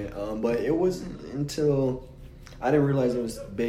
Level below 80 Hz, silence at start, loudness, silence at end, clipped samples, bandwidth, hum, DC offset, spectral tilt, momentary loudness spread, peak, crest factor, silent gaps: -48 dBFS; 0 s; -27 LUFS; 0 s; under 0.1%; 15.5 kHz; none; under 0.1%; -7 dB/octave; 13 LU; -10 dBFS; 16 dB; none